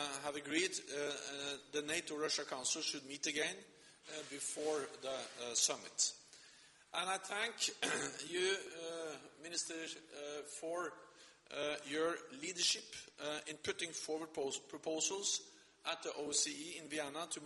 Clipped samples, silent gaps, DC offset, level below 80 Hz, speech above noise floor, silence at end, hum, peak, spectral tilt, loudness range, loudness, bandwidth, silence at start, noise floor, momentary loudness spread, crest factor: under 0.1%; none; under 0.1%; -84 dBFS; 22 dB; 0 s; none; -18 dBFS; -0.5 dB/octave; 4 LU; -40 LUFS; 11.5 kHz; 0 s; -64 dBFS; 12 LU; 24 dB